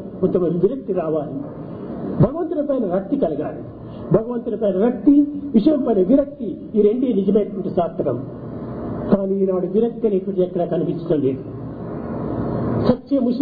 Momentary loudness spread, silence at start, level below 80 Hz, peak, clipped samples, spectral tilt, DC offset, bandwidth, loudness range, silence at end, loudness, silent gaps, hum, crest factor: 13 LU; 0 s; -46 dBFS; -2 dBFS; under 0.1%; -12.5 dB/octave; under 0.1%; 4.9 kHz; 4 LU; 0 s; -20 LUFS; none; none; 18 dB